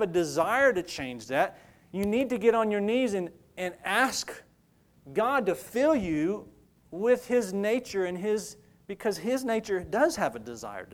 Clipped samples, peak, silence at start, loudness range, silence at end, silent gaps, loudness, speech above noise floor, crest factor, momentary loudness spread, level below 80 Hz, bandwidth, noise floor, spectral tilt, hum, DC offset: under 0.1%; -10 dBFS; 0 s; 3 LU; 0.1 s; none; -28 LUFS; 36 dB; 20 dB; 13 LU; -60 dBFS; 18.5 kHz; -64 dBFS; -4.5 dB/octave; none; under 0.1%